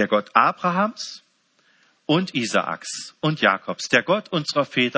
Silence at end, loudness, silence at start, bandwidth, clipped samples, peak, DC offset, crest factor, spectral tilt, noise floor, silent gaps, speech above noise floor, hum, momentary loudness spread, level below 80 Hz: 0 s; -21 LUFS; 0 s; 8 kHz; under 0.1%; -2 dBFS; under 0.1%; 22 dB; -4.5 dB/octave; -63 dBFS; none; 41 dB; none; 12 LU; -72 dBFS